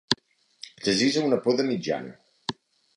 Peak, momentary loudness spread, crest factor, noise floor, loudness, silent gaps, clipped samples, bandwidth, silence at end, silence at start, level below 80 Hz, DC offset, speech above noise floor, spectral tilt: -2 dBFS; 19 LU; 26 dB; -50 dBFS; -26 LUFS; none; under 0.1%; 11.5 kHz; 0.45 s; 0.1 s; -66 dBFS; under 0.1%; 25 dB; -4 dB/octave